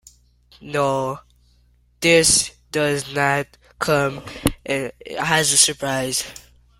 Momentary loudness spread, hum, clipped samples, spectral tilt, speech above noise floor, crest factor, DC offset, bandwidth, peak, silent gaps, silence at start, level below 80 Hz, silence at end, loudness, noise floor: 13 LU; 60 Hz at -50 dBFS; under 0.1%; -2.5 dB/octave; 37 dB; 22 dB; under 0.1%; 16 kHz; 0 dBFS; none; 0.6 s; -46 dBFS; 0.4 s; -19 LUFS; -57 dBFS